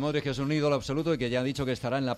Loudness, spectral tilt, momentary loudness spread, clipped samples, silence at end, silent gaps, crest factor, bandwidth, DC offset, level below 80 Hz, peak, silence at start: -29 LUFS; -6 dB/octave; 3 LU; under 0.1%; 0 s; none; 14 dB; 13.5 kHz; under 0.1%; -52 dBFS; -14 dBFS; 0 s